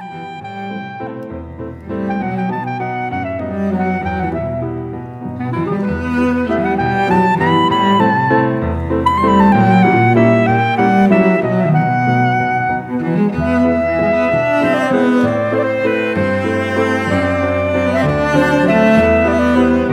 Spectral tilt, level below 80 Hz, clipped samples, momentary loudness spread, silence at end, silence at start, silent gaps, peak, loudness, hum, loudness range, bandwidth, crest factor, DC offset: -7.5 dB/octave; -36 dBFS; under 0.1%; 14 LU; 0 s; 0 s; none; 0 dBFS; -14 LUFS; none; 8 LU; 11 kHz; 14 dB; under 0.1%